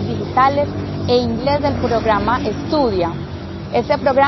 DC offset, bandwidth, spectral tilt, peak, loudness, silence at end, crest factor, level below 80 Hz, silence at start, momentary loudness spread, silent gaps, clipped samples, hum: under 0.1%; 6.2 kHz; -7 dB/octave; -2 dBFS; -18 LUFS; 0 s; 16 dB; -34 dBFS; 0 s; 7 LU; none; under 0.1%; none